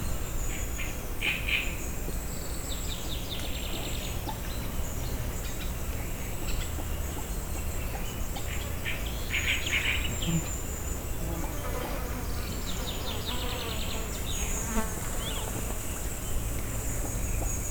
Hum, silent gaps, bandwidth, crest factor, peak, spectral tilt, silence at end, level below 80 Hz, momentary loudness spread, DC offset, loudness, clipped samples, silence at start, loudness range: none; none; over 20 kHz; 18 dB; -14 dBFS; -3.5 dB/octave; 0 s; -34 dBFS; 7 LU; under 0.1%; -33 LUFS; under 0.1%; 0 s; 4 LU